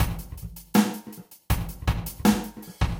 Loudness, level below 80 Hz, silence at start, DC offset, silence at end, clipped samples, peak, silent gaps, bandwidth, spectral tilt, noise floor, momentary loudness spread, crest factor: -26 LUFS; -34 dBFS; 0 s; under 0.1%; 0 s; under 0.1%; -6 dBFS; none; 17 kHz; -5.5 dB/octave; -45 dBFS; 16 LU; 20 dB